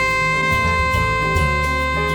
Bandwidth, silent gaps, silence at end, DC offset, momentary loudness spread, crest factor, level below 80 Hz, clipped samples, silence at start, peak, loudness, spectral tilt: over 20 kHz; none; 0 s; under 0.1%; 2 LU; 12 dB; -28 dBFS; under 0.1%; 0 s; -6 dBFS; -17 LUFS; -5 dB/octave